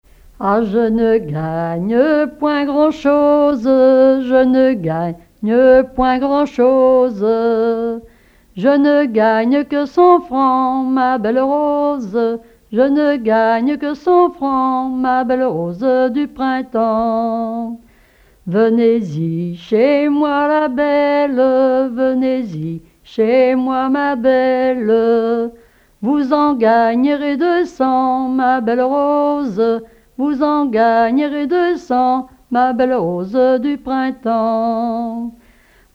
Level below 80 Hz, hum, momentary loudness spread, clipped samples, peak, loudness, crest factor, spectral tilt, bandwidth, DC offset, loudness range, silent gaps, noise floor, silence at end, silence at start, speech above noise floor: -48 dBFS; none; 8 LU; under 0.1%; 0 dBFS; -15 LUFS; 14 dB; -8 dB/octave; 7 kHz; under 0.1%; 4 LU; none; -50 dBFS; 0.65 s; 0.4 s; 35 dB